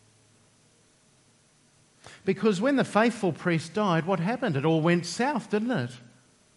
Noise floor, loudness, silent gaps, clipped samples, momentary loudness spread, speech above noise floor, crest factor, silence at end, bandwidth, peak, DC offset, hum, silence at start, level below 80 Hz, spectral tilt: -62 dBFS; -26 LUFS; none; under 0.1%; 6 LU; 37 dB; 20 dB; 0.6 s; 11.5 kHz; -8 dBFS; under 0.1%; none; 2.05 s; -74 dBFS; -6 dB/octave